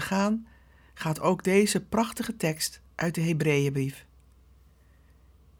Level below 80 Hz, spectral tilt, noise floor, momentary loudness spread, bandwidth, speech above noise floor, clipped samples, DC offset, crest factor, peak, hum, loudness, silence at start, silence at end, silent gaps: -58 dBFS; -5 dB/octave; -58 dBFS; 10 LU; over 20 kHz; 31 dB; under 0.1%; under 0.1%; 20 dB; -10 dBFS; none; -27 LUFS; 0 s; 1.6 s; none